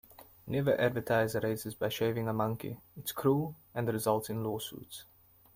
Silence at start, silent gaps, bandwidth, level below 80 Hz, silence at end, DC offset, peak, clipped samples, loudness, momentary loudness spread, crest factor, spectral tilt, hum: 0.1 s; none; 16.5 kHz; -66 dBFS; 0.55 s; under 0.1%; -14 dBFS; under 0.1%; -33 LUFS; 13 LU; 20 dB; -5.5 dB/octave; none